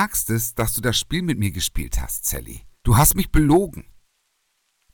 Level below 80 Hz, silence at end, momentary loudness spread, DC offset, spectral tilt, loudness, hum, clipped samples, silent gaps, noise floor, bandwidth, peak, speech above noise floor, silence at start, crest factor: -30 dBFS; 1.15 s; 14 LU; under 0.1%; -4.5 dB/octave; -21 LUFS; none; under 0.1%; none; -70 dBFS; 19.5 kHz; -2 dBFS; 49 dB; 0 s; 20 dB